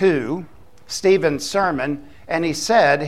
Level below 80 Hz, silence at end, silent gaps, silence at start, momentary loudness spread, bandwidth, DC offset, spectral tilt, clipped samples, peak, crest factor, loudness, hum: -52 dBFS; 0 s; none; 0 s; 13 LU; 14 kHz; 0.7%; -4.5 dB/octave; under 0.1%; -4 dBFS; 16 dB; -20 LUFS; none